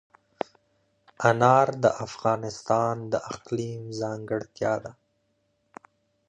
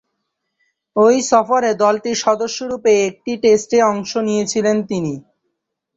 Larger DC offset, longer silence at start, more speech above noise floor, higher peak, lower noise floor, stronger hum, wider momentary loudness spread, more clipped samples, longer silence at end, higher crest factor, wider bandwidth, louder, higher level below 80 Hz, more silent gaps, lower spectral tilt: neither; first, 1.2 s vs 0.95 s; second, 47 dB vs 59 dB; about the same, -4 dBFS vs -2 dBFS; about the same, -72 dBFS vs -75 dBFS; neither; first, 16 LU vs 9 LU; neither; first, 1.35 s vs 0.75 s; first, 24 dB vs 16 dB; first, 9.8 kHz vs 8.2 kHz; second, -26 LUFS vs -16 LUFS; about the same, -64 dBFS vs -60 dBFS; neither; first, -6 dB/octave vs -4 dB/octave